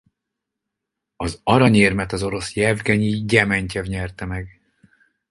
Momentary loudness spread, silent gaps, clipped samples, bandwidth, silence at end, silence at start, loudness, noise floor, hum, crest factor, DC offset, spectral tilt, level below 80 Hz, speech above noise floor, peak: 15 LU; none; under 0.1%; 11.5 kHz; 0.8 s; 1.2 s; -19 LUFS; -82 dBFS; none; 20 dB; under 0.1%; -5.5 dB/octave; -42 dBFS; 63 dB; 0 dBFS